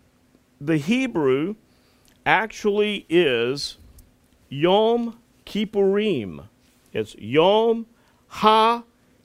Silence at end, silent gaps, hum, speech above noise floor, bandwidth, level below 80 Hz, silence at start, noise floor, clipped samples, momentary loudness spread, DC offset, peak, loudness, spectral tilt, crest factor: 0.4 s; none; none; 39 dB; 15.5 kHz; -58 dBFS; 0.6 s; -59 dBFS; under 0.1%; 15 LU; under 0.1%; -2 dBFS; -21 LUFS; -5.5 dB/octave; 22 dB